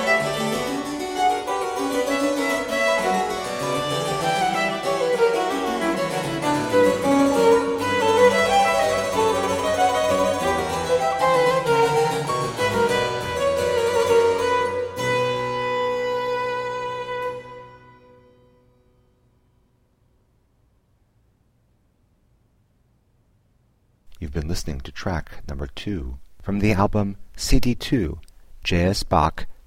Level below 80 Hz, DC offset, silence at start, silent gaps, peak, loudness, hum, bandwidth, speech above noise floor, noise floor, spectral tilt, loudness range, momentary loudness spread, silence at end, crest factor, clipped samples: -38 dBFS; under 0.1%; 0 s; none; -4 dBFS; -22 LUFS; none; 16.5 kHz; 42 dB; -63 dBFS; -4.5 dB/octave; 14 LU; 12 LU; 0.1 s; 18 dB; under 0.1%